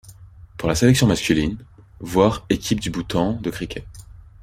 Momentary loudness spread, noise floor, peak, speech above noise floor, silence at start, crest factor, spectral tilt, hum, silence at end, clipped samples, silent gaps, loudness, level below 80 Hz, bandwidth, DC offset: 17 LU; -43 dBFS; -2 dBFS; 24 dB; 0.05 s; 20 dB; -5.5 dB/octave; none; 0.25 s; under 0.1%; none; -21 LUFS; -40 dBFS; 15.5 kHz; under 0.1%